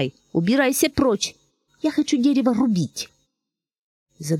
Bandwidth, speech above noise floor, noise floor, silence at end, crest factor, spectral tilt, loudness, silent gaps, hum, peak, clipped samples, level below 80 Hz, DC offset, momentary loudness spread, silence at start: 17 kHz; 63 dB; -83 dBFS; 0 s; 16 dB; -5 dB/octave; -21 LUFS; 3.78-4.06 s; none; -6 dBFS; under 0.1%; -52 dBFS; under 0.1%; 10 LU; 0 s